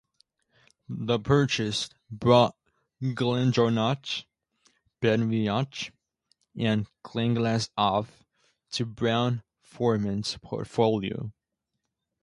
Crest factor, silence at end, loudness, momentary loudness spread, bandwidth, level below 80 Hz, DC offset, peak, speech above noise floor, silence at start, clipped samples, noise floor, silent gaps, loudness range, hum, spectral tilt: 22 dB; 0.95 s; -27 LUFS; 12 LU; 11.5 kHz; -58 dBFS; under 0.1%; -6 dBFS; 57 dB; 0.9 s; under 0.1%; -83 dBFS; none; 4 LU; none; -6 dB/octave